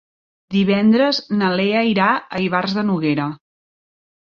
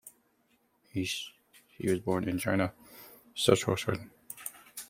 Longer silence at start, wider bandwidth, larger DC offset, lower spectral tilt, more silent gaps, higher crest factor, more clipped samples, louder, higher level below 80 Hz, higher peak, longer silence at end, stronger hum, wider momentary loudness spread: first, 0.5 s vs 0.05 s; second, 6.8 kHz vs 16.5 kHz; neither; first, -7 dB/octave vs -4.5 dB/octave; neither; second, 16 dB vs 26 dB; neither; first, -18 LUFS vs -32 LUFS; first, -58 dBFS vs -66 dBFS; first, -2 dBFS vs -8 dBFS; first, 1 s vs 0.05 s; neither; second, 6 LU vs 19 LU